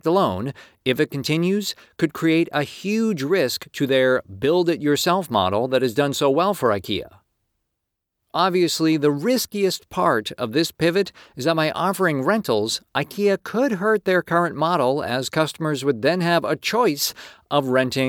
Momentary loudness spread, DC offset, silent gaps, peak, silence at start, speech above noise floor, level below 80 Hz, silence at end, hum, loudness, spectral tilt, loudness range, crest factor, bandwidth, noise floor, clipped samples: 6 LU; under 0.1%; none; -4 dBFS; 0.05 s; 59 dB; -62 dBFS; 0 s; none; -21 LUFS; -5 dB/octave; 2 LU; 18 dB; over 20 kHz; -80 dBFS; under 0.1%